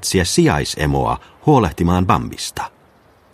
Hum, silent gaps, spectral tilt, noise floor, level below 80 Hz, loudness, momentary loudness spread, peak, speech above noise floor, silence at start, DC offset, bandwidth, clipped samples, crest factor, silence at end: none; none; -5 dB/octave; -51 dBFS; -34 dBFS; -17 LUFS; 10 LU; 0 dBFS; 35 dB; 0 s; under 0.1%; 15.5 kHz; under 0.1%; 18 dB; 0.65 s